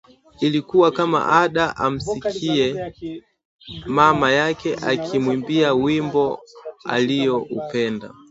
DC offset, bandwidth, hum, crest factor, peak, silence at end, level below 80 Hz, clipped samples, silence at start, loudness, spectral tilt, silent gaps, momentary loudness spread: under 0.1%; 8 kHz; none; 20 dB; 0 dBFS; 0.2 s; -52 dBFS; under 0.1%; 0.4 s; -20 LUFS; -5.5 dB/octave; 3.45-3.59 s; 16 LU